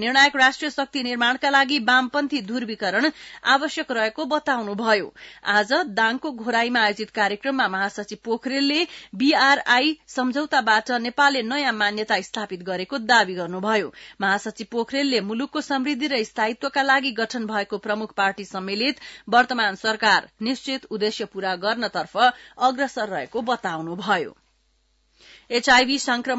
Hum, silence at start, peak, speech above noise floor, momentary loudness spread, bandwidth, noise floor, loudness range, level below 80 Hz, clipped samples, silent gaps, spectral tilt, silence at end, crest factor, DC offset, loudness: none; 0 s; -4 dBFS; 43 dB; 10 LU; 8 kHz; -65 dBFS; 4 LU; -64 dBFS; under 0.1%; none; -3 dB/octave; 0 s; 18 dB; under 0.1%; -22 LUFS